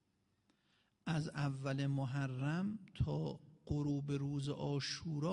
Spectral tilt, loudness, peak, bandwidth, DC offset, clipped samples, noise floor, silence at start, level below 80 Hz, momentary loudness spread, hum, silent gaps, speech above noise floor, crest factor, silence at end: -6.5 dB/octave; -40 LUFS; -26 dBFS; 10.5 kHz; under 0.1%; under 0.1%; -79 dBFS; 1.05 s; -62 dBFS; 5 LU; none; none; 40 dB; 14 dB; 0 s